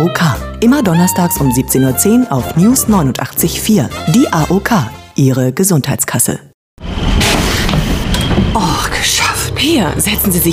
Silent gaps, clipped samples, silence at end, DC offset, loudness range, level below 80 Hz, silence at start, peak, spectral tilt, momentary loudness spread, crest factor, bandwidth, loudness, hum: 6.54-6.77 s; under 0.1%; 0 s; under 0.1%; 2 LU; -24 dBFS; 0 s; 0 dBFS; -4.5 dB/octave; 4 LU; 12 dB; 16 kHz; -12 LUFS; none